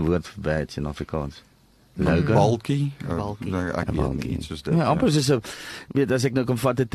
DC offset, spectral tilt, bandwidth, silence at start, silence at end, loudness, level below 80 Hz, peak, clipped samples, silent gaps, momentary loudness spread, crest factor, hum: under 0.1%; -6.5 dB/octave; 13 kHz; 0 s; 0.05 s; -24 LUFS; -40 dBFS; -6 dBFS; under 0.1%; none; 10 LU; 18 dB; none